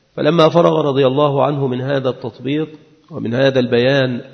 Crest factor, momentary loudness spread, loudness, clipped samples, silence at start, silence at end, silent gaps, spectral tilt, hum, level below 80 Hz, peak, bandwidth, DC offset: 16 dB; 11 LU; -15 LUFS; under 0.1%; 0.15 s; 0.05 s; none; -7.5 dB/octave; none; -58 dBFS; 0 dBFS; 6.6 kHz; under 0.1%